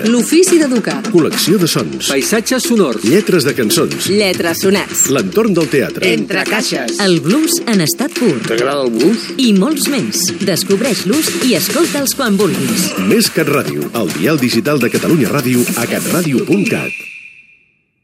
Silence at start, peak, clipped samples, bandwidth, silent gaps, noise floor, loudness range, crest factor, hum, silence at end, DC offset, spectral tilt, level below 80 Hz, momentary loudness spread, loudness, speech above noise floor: 0 s; 0 dBFS; under 0.1%; 16.5 kHz; none; -54 dBFS; 1 LU; 14 dB; none; 0.75 s; under 0.1%; -4 dB/octave; -54 dBFS; 4 LU; -13 LUFS; 41 dB